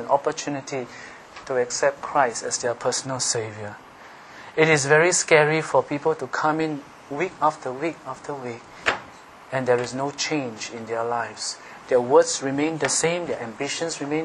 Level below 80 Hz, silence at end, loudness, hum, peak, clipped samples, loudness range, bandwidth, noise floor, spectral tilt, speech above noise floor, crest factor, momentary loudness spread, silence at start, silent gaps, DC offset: -64 dBFS; 0 s; -23 LUFS; none; -2 dBFS; under 0.1%; 6 LU; 11.5 kHz; -45 dBFS; -3.5 dB/octave; 21 dB; 22 dB; 18 LU; 0 s; none; under 0.1%